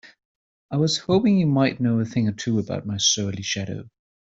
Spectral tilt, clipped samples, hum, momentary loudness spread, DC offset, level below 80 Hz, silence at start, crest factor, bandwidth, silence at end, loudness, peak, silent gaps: -4.5 dB/octave; under 0.1%; none; 9 LU; under 0.1%; -58 dBFS; 0.05 s; 16 dB; 8 kHz; 0.35 s; -22 LUFS; -6 dBFS; 0.25-0.69 s